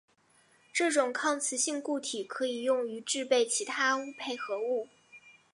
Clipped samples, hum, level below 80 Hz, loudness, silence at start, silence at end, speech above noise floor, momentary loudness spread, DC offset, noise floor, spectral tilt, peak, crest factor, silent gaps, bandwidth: under 0.1%; none; -88 dBFS; -31 LUFS; 0.75 s; 0.25 s; 35 dB; 8 LU; under 0.1%; -66 dBFS; -0.5 dB/octave; -14 dBFS; 18 dB; none; 11.5 kHz